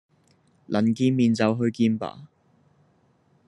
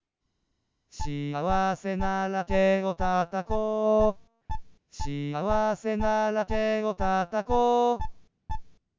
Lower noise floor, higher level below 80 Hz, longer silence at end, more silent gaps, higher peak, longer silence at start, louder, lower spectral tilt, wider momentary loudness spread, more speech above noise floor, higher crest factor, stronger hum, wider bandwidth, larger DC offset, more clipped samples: second, -63 dBFS vs -78 dBFS; second, -70 dBFS vs -42 dBFS; first, 1.25 s vs 0.25 s; neither; first, -6 dBFS vs -10 dBFS; second, 0.7 s vs 0.95 s; first, -23 LUFS vs -27 LUFS; about the same, -7 dB/octave vs -6.5 dB/octave; second, 9 LU vs 17 LU; second, 41 dB vs 53 dB; about the same, 20 dB vs 18 dB; neither; first, 10.5 kHz vs 7.8 kHz; neither; neither